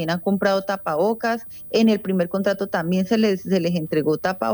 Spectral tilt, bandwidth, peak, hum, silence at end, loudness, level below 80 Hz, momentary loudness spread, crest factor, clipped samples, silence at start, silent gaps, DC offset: -6.5 dB/octave; over 20 kHz; -8 dBFS; none; 0 s; -21 LUFS; -60 dBFS; 5 LU; 14 dB; under 0.1%; 0 s; none; under 0.1%